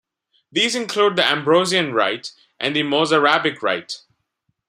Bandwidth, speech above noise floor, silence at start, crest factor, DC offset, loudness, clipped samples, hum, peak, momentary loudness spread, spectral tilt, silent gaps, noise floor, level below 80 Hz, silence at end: 15.5 kHz; 53 dB; 0.55 s; 20 dB; under 0.1%; -18 LUFS; under 0.1%; none; -2 dBFS; 11 LU; -3.5 dB/octave; none; -72 dBFS; -68 dBFS; 0.7 s